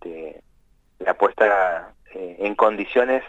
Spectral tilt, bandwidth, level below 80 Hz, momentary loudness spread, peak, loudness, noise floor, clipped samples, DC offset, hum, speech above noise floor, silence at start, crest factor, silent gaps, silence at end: -5.5 dB/octave; 7.8 kHz; -56 dBFS; 18 LU; -4 dBFS; -20 LUFS; -58 dBFS; under 0.1%; under 0.1%; none; 39 dB; 0.05 s; 18 dB; none; 0 s